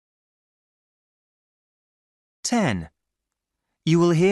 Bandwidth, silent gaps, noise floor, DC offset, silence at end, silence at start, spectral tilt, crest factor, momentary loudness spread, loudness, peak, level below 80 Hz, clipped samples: 12 kHz; none; -83 dBFS; under 0.1%; 0 s; 2.45 s; -6 dB/octave; 18 dB; 13 LU; -22 LUFS; -8 dBFS; -58 dBFS; under 0.1%